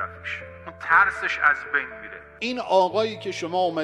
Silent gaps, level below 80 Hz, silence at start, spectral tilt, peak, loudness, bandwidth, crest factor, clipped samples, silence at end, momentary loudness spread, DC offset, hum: none; -56 dBFS; 0 s; -4 dB/octave; -4 dBFS; -23 LUFS; 11 kHz; 20 dB; under 0.1%; 0 s; 17 LU; under 0.1%; none